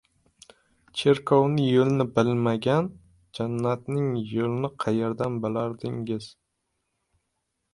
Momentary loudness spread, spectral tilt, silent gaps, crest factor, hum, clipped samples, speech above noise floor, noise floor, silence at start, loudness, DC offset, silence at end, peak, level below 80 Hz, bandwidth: 12 LU; -7.5 dB/octave; none; 20 dB; none; under 0.1%; 54 dB; -78 dBFS; 0.95 s; -25 LUFS; under 0.1%; 1.45 s; -6 dBFS; -62 dBFS; 11.5 kHz